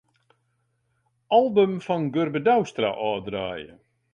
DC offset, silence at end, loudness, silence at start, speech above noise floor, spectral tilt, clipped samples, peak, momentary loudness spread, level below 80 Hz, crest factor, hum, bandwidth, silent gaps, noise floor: under 0.1%; 0.45 s; -23 LUFS; 1.3 s; 49 dB; -6.5 dB/octave; under 0.1%; -8 dBFS; 11 LU; -62 dBFS; 18 dB; none; 8.6 kHz; none; -72 dBFS